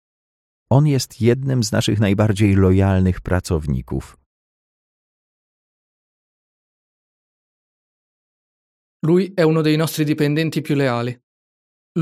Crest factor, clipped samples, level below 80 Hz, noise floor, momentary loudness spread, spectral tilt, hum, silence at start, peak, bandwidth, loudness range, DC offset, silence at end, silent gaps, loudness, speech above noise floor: 18 dB; under 0.1%; -42 dBFS; under -90 dBFS; 9 LU; -6.5 dB/octave; none; 0.7 s; -2 dBFS; 15 kHz; 11 LU; under 0.1%; 0 s; 4.26-9.00 s, 11.23-11.95 s; -18 LUFS; over 73 dB